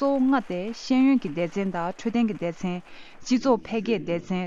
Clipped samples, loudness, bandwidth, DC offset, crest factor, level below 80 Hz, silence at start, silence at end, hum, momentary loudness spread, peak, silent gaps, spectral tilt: under 0.1%; -25 LUFS; 7.6 kHz; under 0.1%; 16 dB; -58 dBFS; 0 s; 0 s; none; 10 LU; -8 dBFS; none; -6.5 dB/octave